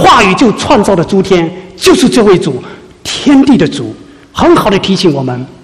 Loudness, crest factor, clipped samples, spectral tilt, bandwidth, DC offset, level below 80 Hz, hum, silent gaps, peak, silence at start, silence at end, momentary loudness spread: -8 LUFS; 8 dB; 2%; -5 dB/octave; 14.5 kHz; 0.4%; -34 dBFS; none; none; 0 dBFS; 0 s; 0.1 s; 12 LU